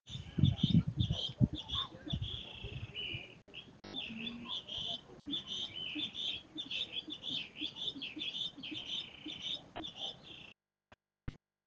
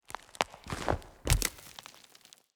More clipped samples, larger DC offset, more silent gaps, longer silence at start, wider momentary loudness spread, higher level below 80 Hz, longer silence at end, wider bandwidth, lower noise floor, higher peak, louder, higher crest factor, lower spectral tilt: neither; neither; neither; about the same, 0.05 s vs 0.1 s; second, 16 LU vs 22 LU; second, -56 dBFS vs -40 dBFS; second, 0.3 s vs 0.65 s; second, 7.8 kHz vs over 20 kHz; first, -69 dBFS vs -59 dBFS; second, -14 dBFS vs -8 dBFS; second, -38 LUFS vs -33 LUFS; about the same, 26 dB vs 28 dB; first, -5.5 dB/octave vs -3.5 dB/octave